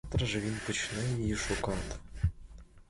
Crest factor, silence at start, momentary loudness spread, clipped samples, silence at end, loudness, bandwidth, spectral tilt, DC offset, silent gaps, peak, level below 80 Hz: 16 dB; 0.05 s; 4 LU; under 0.1%; 0.05 s; -34 LUFS; 11.5 kHz; -4.5 dB/octave; under 0.1%; none; -18 dBFS; -42 dBFS